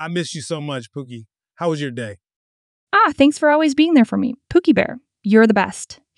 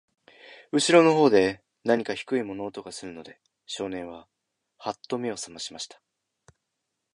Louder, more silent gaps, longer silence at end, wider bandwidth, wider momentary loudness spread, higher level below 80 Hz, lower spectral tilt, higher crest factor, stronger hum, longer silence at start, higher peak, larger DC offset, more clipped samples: first, -17 LUFS vs -25 LUFS; first, 2.36-2.87 s vs none; second, 0.25 s vs 1.3 s; about the same, 11.5 kHz vs 11.5 kHz; second, 17 LU vs 20 LU; first, -54 dBFS vs -66 dBFS; first, -5.5 dB/octave vs -4 dB/octave; about the same, 18 dB vs 22 dB; neither; second, 0 s vs 0.5 s; first, 0 dBFS vs -4 dBFS; neither; neither